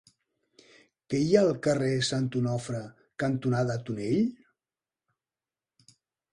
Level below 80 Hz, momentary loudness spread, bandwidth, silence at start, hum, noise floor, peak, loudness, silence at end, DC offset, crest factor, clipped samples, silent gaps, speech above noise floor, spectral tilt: -64 dBFS; 10 LU; 11 kHz; 1.1 s; none; under -90 dBFS; -8 dBFS; -28 LUFS; 2 s; under 0.1%; 22 dB; under 0.1%; none; over 63 dB; -6 dB/octave